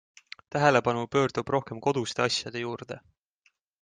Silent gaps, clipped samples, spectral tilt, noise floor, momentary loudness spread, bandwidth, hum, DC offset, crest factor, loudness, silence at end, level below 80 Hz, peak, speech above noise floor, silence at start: none; under 0.1%; -4.5 dB/octave; -71 dBFS; 20 LU; 9.8 kHz; none; under 0.1%; 22 dB; -27 LUFS; 0.85 s; -64 dBFS; -8 dBFS; 43 dB; 0.55 s